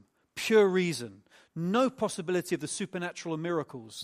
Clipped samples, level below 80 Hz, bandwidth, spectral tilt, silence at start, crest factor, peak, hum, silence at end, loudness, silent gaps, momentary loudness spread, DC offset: under 0.1%; -74 dBFS; 15 kHz; -5 dB/octave; 0.35 s; 18 dB; -12 dBFS; none; 0 s; -30 LUFS; none; 16 LU; under 0.1%